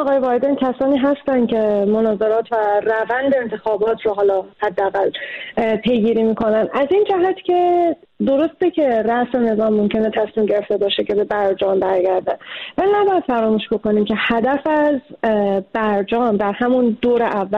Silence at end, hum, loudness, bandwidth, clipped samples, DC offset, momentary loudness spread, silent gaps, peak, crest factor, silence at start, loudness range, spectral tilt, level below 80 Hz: 0 s; none; -18 LUFS; 5.6 kHz; under 0.1%; 0.1%; 4 LU; none; -8 dBFS; 10 dB; 0 s; 1 LU; -8 dB/octave; -52 dBFS